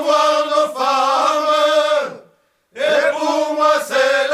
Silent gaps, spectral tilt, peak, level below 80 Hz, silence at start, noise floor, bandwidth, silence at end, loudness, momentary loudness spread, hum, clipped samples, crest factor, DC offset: none; -1.5 dB/octave; -2 dBFS; -72 dBFS; 0 s; -57 dBFS; 15 kHz; 0 s; -16 LUFS; 4 LU; none; under 0.1%; 14 dB; under 0.1%